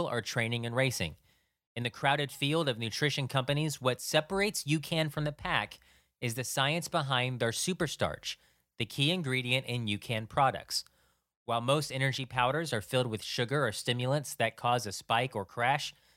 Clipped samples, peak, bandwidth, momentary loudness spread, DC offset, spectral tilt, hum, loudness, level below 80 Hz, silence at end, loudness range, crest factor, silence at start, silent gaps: under 0.1%; -10 dBFS; 16.5 kHz; 6 LU; under 0.1%; -4 dB/octave; none; -31 LUFS; -62 dBFS; 0.25 s; 1 LU; 22 dB; 0 s; 1.67-1.75 s, 11.36-11.46 s